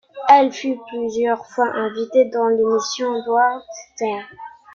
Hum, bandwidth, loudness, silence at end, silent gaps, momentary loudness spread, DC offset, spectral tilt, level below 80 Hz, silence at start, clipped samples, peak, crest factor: none; 7.4 kHz; -19 LUFS; 0.25 s; none; 15 LU; under 0.1%; -3.5 dB/octave; -66 dBFS; 0.15 s; under 0.1%; 0 dBFS; 18 dB